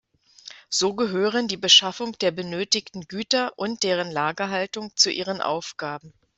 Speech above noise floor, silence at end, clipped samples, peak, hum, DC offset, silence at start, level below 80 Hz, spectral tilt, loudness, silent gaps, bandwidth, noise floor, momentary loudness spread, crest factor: 23 dB; 0.3 s; under 0.1%; -2 dBFS; none; under 0.1%; 0.45 s; -68 dBFS; -2 dB/octave; -22 LUFS; none; 8.4 kHz; -47 dBFS; 18 LU; 22 dB